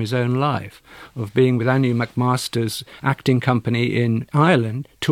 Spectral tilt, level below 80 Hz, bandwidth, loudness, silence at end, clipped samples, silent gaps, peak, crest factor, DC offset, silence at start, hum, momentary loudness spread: -6.5 dB/octave; -56 dBFS; 15.5 kHz; -20 LUFS; 0 s; under 0.1%; none; -4 dBFS; 16 dB; under 0.1%; 0 s; none; 9 LU